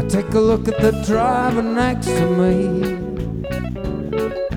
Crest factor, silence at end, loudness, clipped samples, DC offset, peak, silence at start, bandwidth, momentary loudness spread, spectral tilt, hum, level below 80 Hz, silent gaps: 16 dB; 0 s; -19 LUFS; under 0.1%; under 0.1%; -2 dBFS; 0 s; 17.5 kHz; 9 LU; -6.5 dB/octave; none; -34 dBFS; none